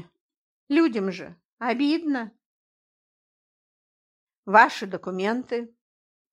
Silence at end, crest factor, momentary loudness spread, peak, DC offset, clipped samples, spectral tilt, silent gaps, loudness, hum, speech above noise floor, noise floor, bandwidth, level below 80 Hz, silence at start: 0.65 s; 24 dB; 22 LU; -2 dBFS; under 0.1%; under 0.1%; -5.5 dB/octave; 1.45-1.57 s, 2.46-4.27 s, 4.37-4.43 s; -24 LUFS; none; over 67 dB; under -90 dBFS; 11 kHz; -78 dBFS; 0.7 s